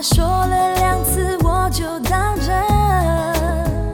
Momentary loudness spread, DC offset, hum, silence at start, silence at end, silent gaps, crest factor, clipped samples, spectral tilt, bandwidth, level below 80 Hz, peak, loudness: 4 LU; 0.2%; none; 0 s; 0 s; none; 14 dB; under 0.1%; -5 dB/octave; 17.5 kHz; -22 dBFS; -2 dBFS; -17 LUFS